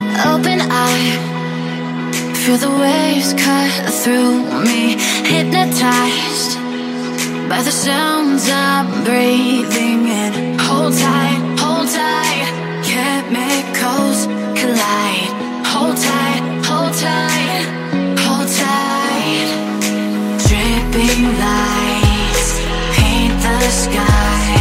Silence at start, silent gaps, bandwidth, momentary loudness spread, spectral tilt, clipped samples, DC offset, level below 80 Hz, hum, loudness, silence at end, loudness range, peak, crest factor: 0 s; none; 16.5 kHz; 5 LU; -4 dB/octave; under 0.1%; under 0.1%; -26 dBFS; none; -15 LUFS; 0 s; 2 LU; 0 dBFS; 14 dB